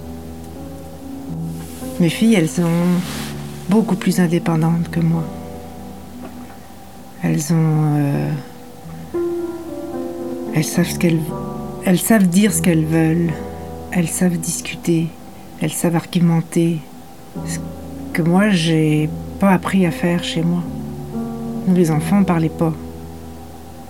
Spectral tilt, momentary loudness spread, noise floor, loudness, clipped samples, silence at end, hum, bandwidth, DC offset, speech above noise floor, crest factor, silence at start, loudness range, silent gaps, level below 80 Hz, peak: -6 dB/octave; 19 LU; -38 dBFS; -18 LUFS; under 0.1%; 0 s; none; 16.5 kHz; 0.8%; 22 dB; 18 dB; 0 s; 5 LU; none; -44 dBFS; -2 dBFS